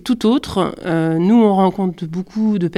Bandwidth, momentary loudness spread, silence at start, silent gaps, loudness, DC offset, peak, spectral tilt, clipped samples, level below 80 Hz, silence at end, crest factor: 12.5 kHz; 10 LU; 0.05 s; none; -17 LUFS; under 0.1%; -2 dBFS; -7.5 dB/octave; under 0.1%; -48 dBFS; 0 s; 14 dB